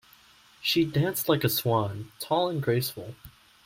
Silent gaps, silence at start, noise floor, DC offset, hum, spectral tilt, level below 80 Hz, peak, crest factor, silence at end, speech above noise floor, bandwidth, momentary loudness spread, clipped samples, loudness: none; 0.6 s; -57 dBFS; under 0.1%; none; -5 dB/octave; -62 dBFS; -10 dBFS; 18 dB; 0.35 s; 30 dB; 16.5 kHz; 11 LU; under 0.1%; -27 LUFS